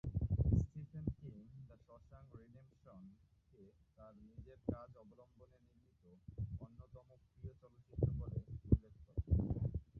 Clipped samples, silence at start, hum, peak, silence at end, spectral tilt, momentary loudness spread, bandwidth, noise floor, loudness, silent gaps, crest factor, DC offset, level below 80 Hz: under 0.1%; 0.05 s; none; -18 dBFS; 0 s; -13.5 dB/octave; 25 LU; 6.4 kHz; -71 dBFS; -42 LUFS; none; 24 dB; under 0.1%; -48 dBFS